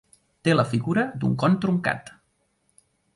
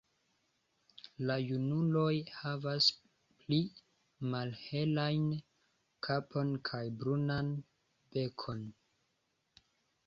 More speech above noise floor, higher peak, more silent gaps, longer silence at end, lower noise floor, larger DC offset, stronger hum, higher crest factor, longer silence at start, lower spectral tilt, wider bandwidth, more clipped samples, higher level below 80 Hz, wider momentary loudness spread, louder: about the same, 47 dB vs 46 dB; first, -6 dBFS vs -16 dBFS; neither; second, 1.05 s vs 1.35 s; second, -70 dBFS vs -81 dBFS; neither; neither; about the same, 20 dB vs 22 dB; second, 0.45 s vs 1.2 s; first, -7 dB/octave vs -5 dB/octave; first, 11.5 kHz vs 7.4 kHz; neither; first, -60 dBFS vs -70 dBFS; second, 6 LU vs 13 LU; first, -24 LUFS vs -36 LUFS